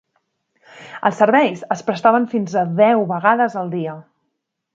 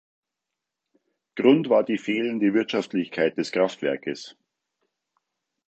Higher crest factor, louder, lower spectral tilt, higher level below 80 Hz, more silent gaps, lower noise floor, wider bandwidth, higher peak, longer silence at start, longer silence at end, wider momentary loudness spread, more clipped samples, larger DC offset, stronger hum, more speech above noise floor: about the same, 18 dB vs 22 dB; first, -17 LUFS vs -23 LUFS; about the same, -6.5 dB/octave vs -6 dB/octave; first, -68 dBFS vs -76 dBFS; neither; second, -75 dBFS vs -85 dBFS; about the same, 7.8 kHz vs 8.2 kHz; first, 0 dBFS vs -4 dBFS; second, 0.75 s vs 1.35 s; second, 0.75 s vs 1.35 s; about the same, 11 LU vs 13 LU; neither; neither; neither; second, 58 dB vs 62 dB